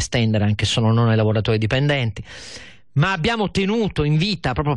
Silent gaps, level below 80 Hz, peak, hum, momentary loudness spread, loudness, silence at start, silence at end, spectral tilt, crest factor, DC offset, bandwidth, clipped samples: none; -40 dBFS; -8 dBFS; none; 15 LU; -19 LUFS; 0 s; 0 s; -6 dB/octave; 12 dB; 0.5%; 10.5 kHz; under 0.1%